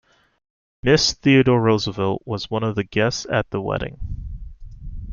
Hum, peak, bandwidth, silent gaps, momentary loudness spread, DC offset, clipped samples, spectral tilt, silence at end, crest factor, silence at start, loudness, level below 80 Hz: none; -2 dBFS; 7.4 kHz; none; 21 LU; under 0.1%; under 0.1%; -5 dB/octave; 0 s; 20 dB; 0.85 s; -20 LUFS; -38 dBFS